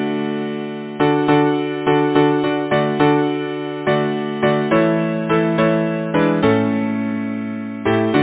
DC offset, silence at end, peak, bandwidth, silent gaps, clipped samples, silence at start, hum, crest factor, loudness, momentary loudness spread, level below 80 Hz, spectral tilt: under 0.1%; 0 s; 0 dBFS; 4 kHz; none; under 0.1%; 0 s; none; 16 dB; -18 LUFS; 8 LU; -52 dBFS; -11 dB/octave